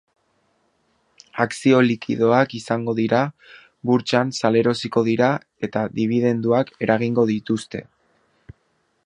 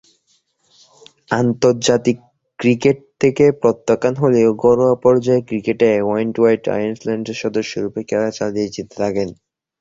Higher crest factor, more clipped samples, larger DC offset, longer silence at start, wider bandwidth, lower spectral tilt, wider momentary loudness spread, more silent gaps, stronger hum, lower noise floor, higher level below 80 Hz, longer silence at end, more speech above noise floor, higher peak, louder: about the same, 20 dB vs 16 dB; neither; neither; about the same, 1.35 s vs 1.3 s; first, 11 kHz vs 8 kHz; about the same, -6.5 dB/octave vs -6 dB/octave; about the same, 9 LU vs 9 LU; neither; neither; first, -67 dBFS vs -62 dBFS; second, -62 dBFS vs -54 dBFS; first, 1.2 s vs 0.45 s; about the same, 48 dB vs 46 dB; about the same, -2 dBFS vs 0 dBFS; second, -20 LUFS vs -17 LUFS